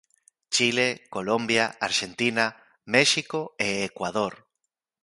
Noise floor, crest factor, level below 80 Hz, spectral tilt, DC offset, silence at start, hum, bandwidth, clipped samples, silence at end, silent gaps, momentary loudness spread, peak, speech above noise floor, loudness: -82 dBFS; 22 dB; -66 dBFS; -2.5 dB/octave; under 0.1%; 0.5 s; none; 11.5 kHz; under 0.1%; 0.7 s; none; 8 LU; -4 dBFS; 57 dB; -24 LUFS